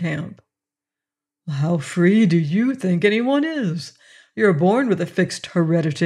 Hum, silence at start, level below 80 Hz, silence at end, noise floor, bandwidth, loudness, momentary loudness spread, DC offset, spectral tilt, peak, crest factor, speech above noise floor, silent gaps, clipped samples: none; 0 s; -68 dBFS; 0 s; -88 dBFS; 11 kHz; -19 LUFS; 14 LU; under 0.1%; -7 dB/octave; -4 dBFS; 16 dB; 69 dB; none; under 0.1%